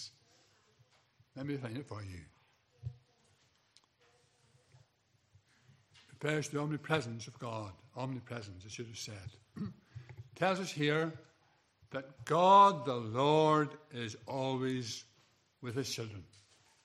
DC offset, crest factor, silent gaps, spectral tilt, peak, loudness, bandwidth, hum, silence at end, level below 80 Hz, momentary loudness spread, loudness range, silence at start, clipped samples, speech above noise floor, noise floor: under 0.1%; 24 dB; none; -5.5 dB/octave; -12 dBFS; -34 LUFS; 14 kHz; none; 0.6 s; -76 dBFS; 22 LU; 17 LU; 0 s; under 0.1%; 40 dB; -74 dBFS